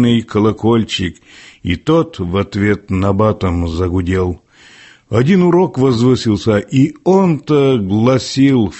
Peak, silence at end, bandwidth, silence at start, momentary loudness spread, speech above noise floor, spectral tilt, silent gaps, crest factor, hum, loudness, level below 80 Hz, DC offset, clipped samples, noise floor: -2 dBFS; 0 s; 8.4 kHz; 0 s; 7 LU; 29 dB; -7 dB/octave; none; 12 dB; none; -14 LUFS; -32 dBFS; under 0.1%; under 0.1%; -42 dBFS